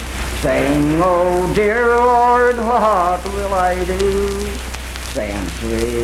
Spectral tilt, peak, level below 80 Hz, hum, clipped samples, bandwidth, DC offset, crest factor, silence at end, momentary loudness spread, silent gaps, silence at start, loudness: -5 dB/octave; -4 dBFS; -28 dBFS; none; under 0.1%; 16.5 kHz; under 0.1%; 12 dB; 0 s; 11 LU; none; 0 s; -16 LUFS